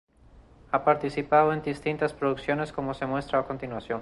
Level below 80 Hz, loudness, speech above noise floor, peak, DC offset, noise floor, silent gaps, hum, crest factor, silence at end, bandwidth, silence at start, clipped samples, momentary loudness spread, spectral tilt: -54 dBFS; -27 LUFS; 28 dB; -8 dBFS; under 0.1%; -54 dBFS; none; none; 20 dB; 0 s; 11.5 kHz; 0.35 s; under 0.1%; 9 LU; -7 dB/octave